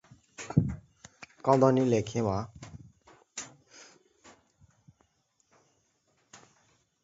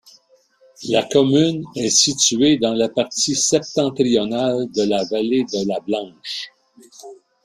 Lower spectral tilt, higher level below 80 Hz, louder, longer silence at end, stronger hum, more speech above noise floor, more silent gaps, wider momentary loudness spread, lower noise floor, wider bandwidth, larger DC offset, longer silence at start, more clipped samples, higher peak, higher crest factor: first, -7 dB/octave vs -3.5 dB/octave; about the same, -56 dBFS vs -58 dBFS; second, -28 LUFS vs -18 LUFS; first, 0.7 s vs 0.3 s; neither; first, 47 dB vs 37 dB; neither; first, 28 LU vs 11 LU; first, -73 dBFS vs -56 dBFS; second, 8 kHz vs 15 kHz; neither; second, 0.4 s vs 0.8 s; neither; second, -8 dBFS vs -2 dBFS; first, 24 dB vs 18 dB